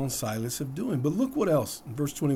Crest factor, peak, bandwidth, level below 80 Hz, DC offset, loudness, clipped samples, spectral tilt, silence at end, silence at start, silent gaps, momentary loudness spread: 16 dB; -12 dBFS; 20 kHz; -58 dBFS; under 0.1%; -29 LUFS; under 0.1%; -6 dB/octave; 0 s; 0 s; none; 7 LU